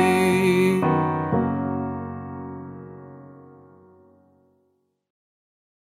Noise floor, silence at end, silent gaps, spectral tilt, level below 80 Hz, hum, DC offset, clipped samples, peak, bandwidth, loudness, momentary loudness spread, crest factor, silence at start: -69 dBFS; 2.35 s; none; -6.5 dB/octave; -62 dBFS; none; under 0.1%; under 0.1%; -6 dBFS; 15 kHz; -22 LUFS; 22 LU; 18 dB; 0 s